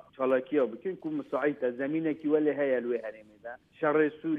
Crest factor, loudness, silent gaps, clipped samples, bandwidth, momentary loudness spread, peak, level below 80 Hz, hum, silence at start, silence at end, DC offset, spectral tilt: 16 dB; -30 LUFS; none; under 0.1%; 3.8 kHz; 17 LU; -14 dBFS; -78 dBFS; none; 0.2 s; 0 s; under 0.1%; -9 dB/octave